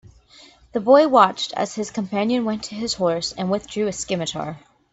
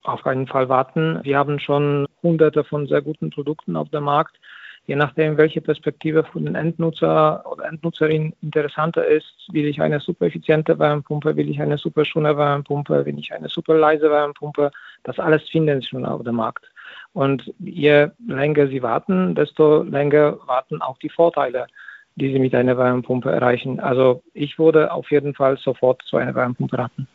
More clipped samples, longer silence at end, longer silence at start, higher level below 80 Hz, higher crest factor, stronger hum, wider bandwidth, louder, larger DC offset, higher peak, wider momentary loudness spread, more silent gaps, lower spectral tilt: neither; first, 0.35 s vs 0.1 s; first, 0.75 s vs 0.05 s; first, -56 dBFS vs -64 dBFS; about the same, 20 dB vs 18 dB; neither; first, 8.4 kHz vs 4.5 kHz; about the same, -21 LUFS vs -20 LUFS; neither; about the same, 0 dBFS vs -2 dBFS; about the same, 12 LU vs 11 LU; neither; about the same, -4.5 dB/octave vs -5.5 dB/octave